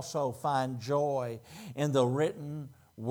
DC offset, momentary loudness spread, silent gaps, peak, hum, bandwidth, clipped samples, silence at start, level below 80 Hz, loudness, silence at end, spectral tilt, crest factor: under 0.1%; 15 LU; none; -14 dBFS; none; over 20 kHz; under 0.1%; 0 s; -76 dBFS; -32 LUFS; 0 s; -6 dB/octave; 18 dB